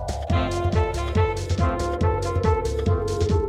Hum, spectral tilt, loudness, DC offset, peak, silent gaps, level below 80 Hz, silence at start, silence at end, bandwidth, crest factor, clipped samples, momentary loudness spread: none; -6.5 dB/octave; -24 LUFS; under 0.1%; -8 dBFS; none; -30 dBFS; 0 s; 0 s; 11.5 kHz; 14 dB; under 0.1%; 1 LU